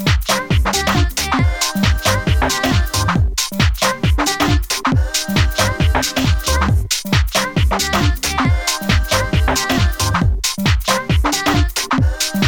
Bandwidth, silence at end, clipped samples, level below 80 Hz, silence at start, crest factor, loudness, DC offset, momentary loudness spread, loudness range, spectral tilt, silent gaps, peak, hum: over 20 kHz; 0 s; under 0.1%; -22 dBFS; 0 s; 14 dB; -16 LUFS; under 0.1%; 2 LU; 0 LU; -4 dB/octave; none; 0 dBFS; none